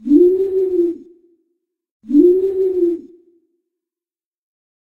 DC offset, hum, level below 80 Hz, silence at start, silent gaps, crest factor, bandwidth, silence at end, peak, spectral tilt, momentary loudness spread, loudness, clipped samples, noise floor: under 0.1%; none; -56 dBFS; 0.05 s; 1.91-2.00 s; 16 dB; 1.9 kHz; 2 s; -2 dBFS; -9 dB/octave; 9 LU; -15 LUFS; under 0.1%; under -90 dBFS